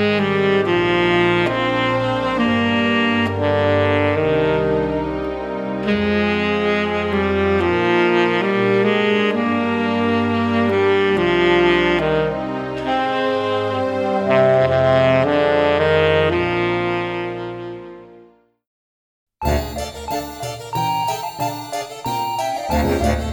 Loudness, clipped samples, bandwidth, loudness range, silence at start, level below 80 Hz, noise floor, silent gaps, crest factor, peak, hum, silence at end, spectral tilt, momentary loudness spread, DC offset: -18 LUFS; under 0.1%; 19.5 kHz; 9 LU; 0 s; -38 dBFS; -49 dBFS; 18.67-19.27 s; 16 dB; -2 dBFS; none; 0 s; -6 dB/octave; 10 LU; under 0.1%